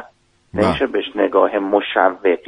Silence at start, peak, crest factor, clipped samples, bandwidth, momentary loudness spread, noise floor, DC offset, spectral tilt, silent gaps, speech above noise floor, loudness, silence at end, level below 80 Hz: 0 s; 0 dBFS; 16 dB; under 0.1%; 10 kHz; 5 LU; -51 dBFS; under 0.1%; -6.5 dB/octave; none; 34 dB; -17 LUFS; 0.1 s; -48 dBFS